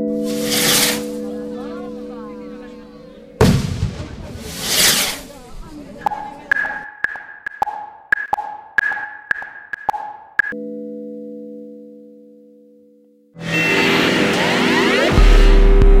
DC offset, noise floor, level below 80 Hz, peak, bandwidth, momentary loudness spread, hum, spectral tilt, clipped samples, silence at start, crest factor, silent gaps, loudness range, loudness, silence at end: under 0.1%; -51 dBFS; -22 dBFS; 0 dBFS; 16 kHz; 20 LU; none; -3.5 dB/octave; under 0.1%; 0 s; 16 dB; none; 10 LU; -17 LUFS; 0 s